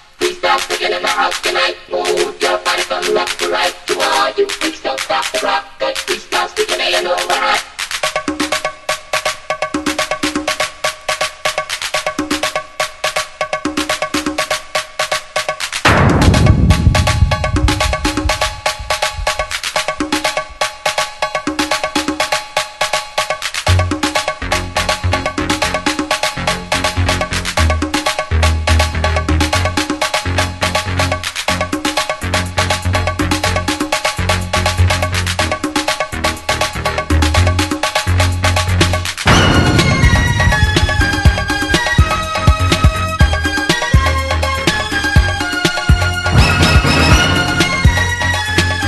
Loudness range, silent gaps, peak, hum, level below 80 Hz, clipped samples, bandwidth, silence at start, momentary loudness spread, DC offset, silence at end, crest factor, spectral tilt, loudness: 6 LU; none; 0 dBFS; none; -22 dBFS; under 0.1%; 12.5 kHz; 0.2 s; 7 LU; under 0.1%; 0 s; 14 dB; -4 dB/octave; -15 LUFS